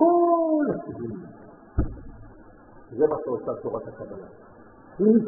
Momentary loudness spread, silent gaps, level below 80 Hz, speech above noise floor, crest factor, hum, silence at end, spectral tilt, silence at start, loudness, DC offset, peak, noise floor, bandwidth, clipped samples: 23 LU; none; -42 dBFS; 24 dB; 20 dB; none; 0 s; -1.5 dB/octave; 0 s; -25 LUFS; under 0.1%; -6 dBFS; -49 dBFS; 1.9 kHz; under 0.1%